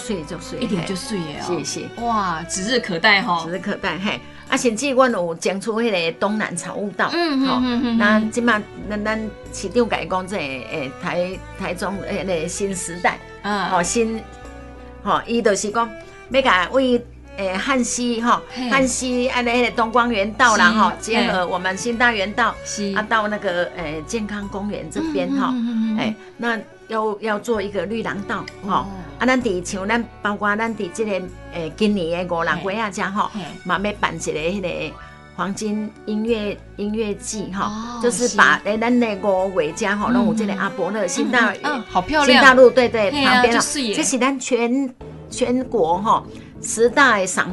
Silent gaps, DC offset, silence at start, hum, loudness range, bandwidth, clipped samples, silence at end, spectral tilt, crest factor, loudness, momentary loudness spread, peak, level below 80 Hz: none; under 0.1%; 0 s; none; 9 LU; 11.5 kHz; under 0.1%; 0 s; -3.5 dB/octave; 20 dB; -20 LUFS; 12 LU; 0 dBFS; -44 dBFS